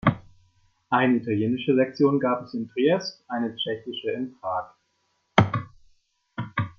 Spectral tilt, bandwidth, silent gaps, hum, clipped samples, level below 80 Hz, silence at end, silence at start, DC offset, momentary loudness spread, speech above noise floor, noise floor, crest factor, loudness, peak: -7 dB/octave; 6.8 kHz; none; none; under 0.1%; -58 dBFS; 0.05 s; 0.05 s; under 0.1%; 11 LU; 47 dB; -72 dBFS; 24 dB; -25 LUFS; -2 dBFS